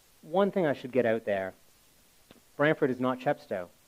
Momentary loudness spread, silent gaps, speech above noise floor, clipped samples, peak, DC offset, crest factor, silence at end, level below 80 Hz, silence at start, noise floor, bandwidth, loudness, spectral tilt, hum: 9 LU; none; 33 dB; under 0.1%; -10 dBFS; under 0.1%; 20 dB; 0.2 s; -72 dBFS; 0.25 s; -62 dBFS; 16 kHz; -29 LUFS; -7 dB/octave; none